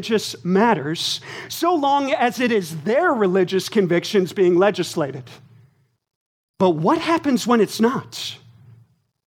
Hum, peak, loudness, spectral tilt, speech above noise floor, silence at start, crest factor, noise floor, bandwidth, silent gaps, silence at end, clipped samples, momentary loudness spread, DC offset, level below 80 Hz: none; -2 dBFS; -20 LUFS; -5 dB/octave; 37 dB; 0 s; 18 dB; -56 dBFS; 17.5 kHz; 6.15-6.54 s; 0.9 s; under 0.1%; 9 LU; under 0.1%; -68 dBFS